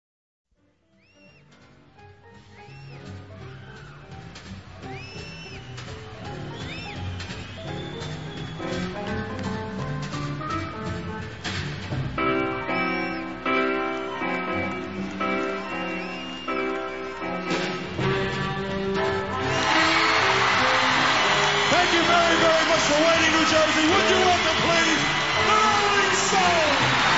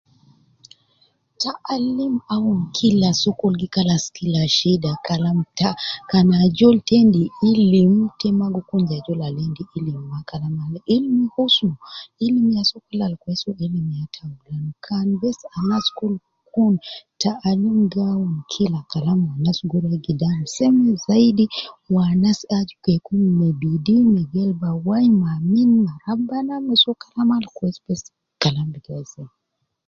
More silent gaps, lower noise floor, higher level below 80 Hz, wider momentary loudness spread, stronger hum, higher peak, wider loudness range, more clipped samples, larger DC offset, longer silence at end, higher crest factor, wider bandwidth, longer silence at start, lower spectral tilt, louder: neither; about the same, -65 dBFS vs -62 dBFS; about the same, -50 dBFS vs -54 dBFS; first, 19 LU vs 12 LU; neither; second, -6 dBFS vs -2 dBFS; first, 19 LU vs 6 LU; neither; first, 0.3% vs under 0.1%; second, 0 s vs 0.6 s; about the same, 18 dB vs 18 dB; about the same, 8 kHz vs 7.6 kHz; second, 1.2 s vs 1.4 s; second, -3.5 dB/octave vs -6.5 dB/octave; second, -22 LUFS vs -19 LUFS